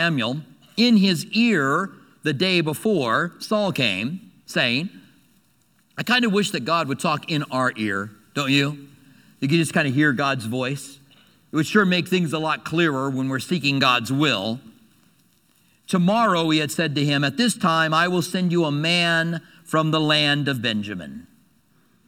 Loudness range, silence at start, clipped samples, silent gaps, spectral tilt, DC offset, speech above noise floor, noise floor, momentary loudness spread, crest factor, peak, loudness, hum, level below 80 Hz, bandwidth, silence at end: 3 LU; 0 s; under 0.1%; none; -5 dB/octave; under 0.1%; 41 dB; -62 dBFS; 11 LU; 20 dB; -2 dBFS; -21 LUFS; none; -68 dBFS; 18 kHz; 0.85 s